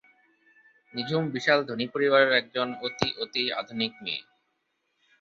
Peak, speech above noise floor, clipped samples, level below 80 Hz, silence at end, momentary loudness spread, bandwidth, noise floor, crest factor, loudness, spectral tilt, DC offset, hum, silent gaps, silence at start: -6 dBFS; 49 dB; under 0.1%; -66 dBFS; 1 s; 12 LU; 7.6 kHz; -76 dBFS; 22 dB; -26 LUFS; -5 dB/octave; under 0.1%; none; none; 0.95 s